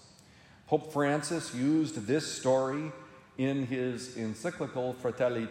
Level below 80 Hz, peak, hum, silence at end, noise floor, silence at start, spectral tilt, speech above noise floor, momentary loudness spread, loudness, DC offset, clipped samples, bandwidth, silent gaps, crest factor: -72 dBFS; -12 dBFS; none; 0 s; -57 dBFS; 0.65 s; -5.5 dB/octave; 26 dB; 8 LU; -32 LUFS; under 0.1%; under 0.1%; 16 kHz; none; 18 dB